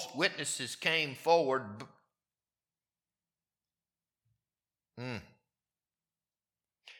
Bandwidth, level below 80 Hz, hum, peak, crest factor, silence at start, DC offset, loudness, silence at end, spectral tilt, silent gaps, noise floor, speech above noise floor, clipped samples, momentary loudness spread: 16.5 kHz; -78 dBFS; none; -12 dBFS; 26 dB; 0 s; under 0.1%; -32 LUFS; 0 s; -3 dB/octave; none; under -90 dBFS; over 57 dB; under 0.1%; 18 LU